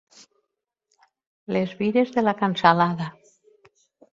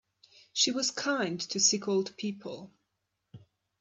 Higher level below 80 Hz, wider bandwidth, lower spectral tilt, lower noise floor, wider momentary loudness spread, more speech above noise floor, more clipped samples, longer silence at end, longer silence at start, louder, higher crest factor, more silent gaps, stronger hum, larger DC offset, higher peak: first, -66 dBFS vs -80 dBFS; second, 7.6 kHz vs 9.6 kHz; first, -7 dB/octave vs -2 dB/octave; about the same, -82 dBFS vs -82 dBFS; second, 11 LU vs 15 LU; first, 60 dB vs 52 dB; neither; first, 1.05 s vs 0.4 s; first, 1.5 s vs 0.55 s; first, -22 LUFS vs -29 LUFS; about the same, 24 dB vs 22 dB; neither; neither; neither; first, -2 dBFS vs -12 dBFS